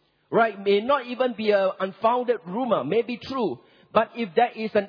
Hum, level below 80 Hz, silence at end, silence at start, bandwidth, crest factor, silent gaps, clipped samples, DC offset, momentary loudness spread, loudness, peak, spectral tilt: none; -68 dBFS; 0 s; 0.3 s; 5.4 kHz; 18 dB; none; under 0.1%; under 0.1%; 6 LU; -24 LUFS; -6 dBFS; -7.5 dB/octave